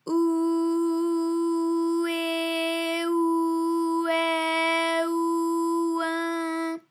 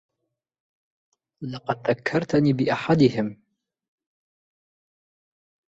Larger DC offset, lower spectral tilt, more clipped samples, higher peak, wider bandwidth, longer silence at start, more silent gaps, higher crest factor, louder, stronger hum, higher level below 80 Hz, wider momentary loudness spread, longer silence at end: neither; second, -2 dB/octave vs -7.5 dB/octave; neither; second, -14 dBFS vs -6 dBFS; first, 14.5 kHz vs 8 kHz; second, 0.05 s vs 1.4 s; neither; second, 10 dB vs 22 dB; about the same, -25 LUFS vs -23 LUFS; neither; second, under -90 dBFS vs -62 dBFS; second, 3 LU vs 14 LU; second, 0.1 s vs 2.45 s